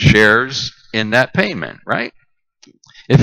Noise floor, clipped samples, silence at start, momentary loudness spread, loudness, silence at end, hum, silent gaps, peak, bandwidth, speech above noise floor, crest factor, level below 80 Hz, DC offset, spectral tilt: -51 dBFS; under 0.1%; 0 s; 12 LU; -15 LUFS; 0 s; none; none; 0 dBFS; 12 kHz; 36 dB; 16 dB; -38 dBFS; under 0.1%; -5.5 dB/octave